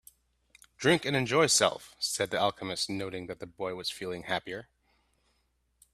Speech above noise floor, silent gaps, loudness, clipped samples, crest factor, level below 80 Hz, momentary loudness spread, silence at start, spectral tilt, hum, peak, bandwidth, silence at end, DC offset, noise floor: 44 dB; none; -29 LUFS; under 0.1%; 24 dB; -66 dBFS; 14 LU; 0.8 s; -3 dB/octave; none; -8 dBFS; 15 kHz; 1.3 s; under 0.1%; -74 dBFS